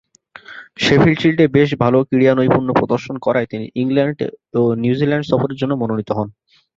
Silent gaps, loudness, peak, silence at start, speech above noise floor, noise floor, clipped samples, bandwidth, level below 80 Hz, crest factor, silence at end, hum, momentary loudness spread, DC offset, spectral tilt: none; -16 LUFS; -2 dBFS; 0.5 s; 25 dB; -41 dBFS; under 0.1%; 7.8 kHz; -48 dBFS; 16 dB; 0.45 s; none; 10 LU; under 0.1%; -7 dB/octave